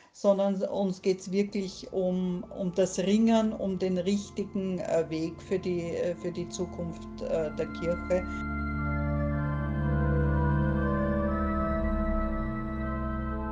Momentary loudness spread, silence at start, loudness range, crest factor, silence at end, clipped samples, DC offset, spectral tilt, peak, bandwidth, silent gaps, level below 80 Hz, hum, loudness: 8 LU; 0.15 s; 4 LU; 18 dB; 0 s; under 0.1%; under 0.1%; -7 dB/octave; -12 dBFS; 9.6 kHz; none; -38 dBFS; none; -30 LUFS